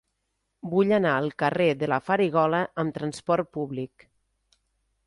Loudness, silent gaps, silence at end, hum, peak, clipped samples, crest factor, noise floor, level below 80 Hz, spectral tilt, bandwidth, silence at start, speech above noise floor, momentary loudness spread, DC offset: -25 LUFS; none; 1.2 s; none; -8 dBFS; under 0.1%; 18 dB; -78 dBFS; -64 dBFS; -7 dB/octave; 11.5 kHz; 0.65 s; 53 dB; 11 LU; under 0.1%